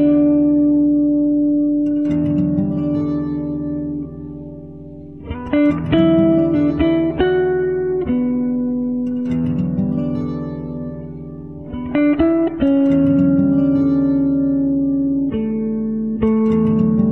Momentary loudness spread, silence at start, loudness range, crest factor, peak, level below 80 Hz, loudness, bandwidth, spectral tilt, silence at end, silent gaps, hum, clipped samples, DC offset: 15 LU; 0 s; 6 LU; 14 dB; -4 dBFS; -42 dBFS; -17 LUFS; 4.2 kHz; -10.5 dB/octave; 0 s; none; none; under 0.1%; 0.5%